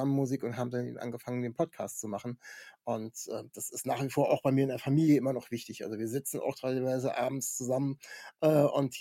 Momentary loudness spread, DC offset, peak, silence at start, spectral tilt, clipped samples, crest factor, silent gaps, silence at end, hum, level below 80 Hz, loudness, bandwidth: 13 LU; under 0.1%; -14 dBFS; 0 s; -6 dB/octave; under 0.1%; 18 dB; none; 0 s; none; -76 dBFS; -32 LUFS; 17 kHz